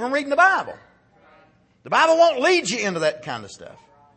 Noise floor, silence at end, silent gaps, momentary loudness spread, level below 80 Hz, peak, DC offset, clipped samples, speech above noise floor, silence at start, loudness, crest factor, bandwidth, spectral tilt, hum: -56 dBFS; 0.45 s; none; 17 LU; -68 dBFS; -4 dBFS; under 0.1%; under 0.1%; 36 dB; 0 s; -19 LUFS; 18 dB; 8.8 kHz; -3 dB/octave; none